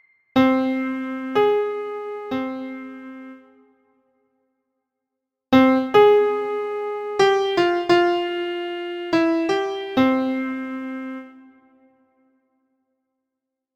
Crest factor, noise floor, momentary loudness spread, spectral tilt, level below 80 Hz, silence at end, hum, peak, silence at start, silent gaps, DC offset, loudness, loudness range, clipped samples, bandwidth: 20 dB; -83 dBFS; 16 LU; -5.5 dB/octave; -62 dBFS; 2.35 s; none; -2 dBFS; 0.35 s; none; under 0.1%; -20 LUFS; 15 LU; under 0.1%; 14.5 kHz